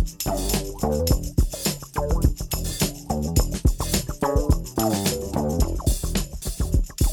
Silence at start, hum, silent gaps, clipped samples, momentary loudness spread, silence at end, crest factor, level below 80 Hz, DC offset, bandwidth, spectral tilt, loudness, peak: 0 s; none; none; under 0.1%; 5 LU; 0 s; 20 dB; -26 dBFS; under 0.1%; over 20 kHz; -5 dB/octave; -25 LUFS; -4 dBFS